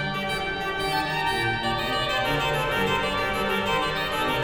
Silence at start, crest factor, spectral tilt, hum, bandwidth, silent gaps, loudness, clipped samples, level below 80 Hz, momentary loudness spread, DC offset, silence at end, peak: 0 s; 14 dB; -4 dB/octave; none; 19 kHz; none; -25 LUFS; under 0.1%; -42 dBFS; 3 LU; under 0.1%; 0 s; -12 dBFS